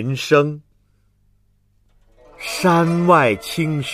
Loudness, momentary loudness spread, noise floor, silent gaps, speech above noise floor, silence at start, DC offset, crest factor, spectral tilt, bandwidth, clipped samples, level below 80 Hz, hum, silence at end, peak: -17 LUFS; 13 LU; -59 dBFS; none; 43 dB; 0 s; under 0.1%; 18 dB; -6 dB/octave; 15.5 kHz; under 0.1%; -54 dBFS; 50 Hz at -55 dBFS; 0 s; -2 dBFS